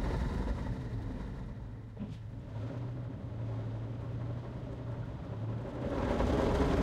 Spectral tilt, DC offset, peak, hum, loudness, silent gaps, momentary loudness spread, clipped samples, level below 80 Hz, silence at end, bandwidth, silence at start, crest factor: -8 dB/octave; under 0.1%; -18 dBFS; none; -38 LUFS; none; 13 LU; under 0.1%; -42 dBFS; 0 s; 10.5 kHz; 0 s; 18 dB